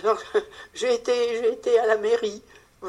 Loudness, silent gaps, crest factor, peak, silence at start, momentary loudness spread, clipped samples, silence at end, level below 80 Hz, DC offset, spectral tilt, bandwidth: -24 LUFS; none; 16 dB; -8 dBFS; 0 s; 10 LU; under 0.1%; 0 s; -64 dBFS; under 0.1%; -2.5 dB/octave; 11.5 kHz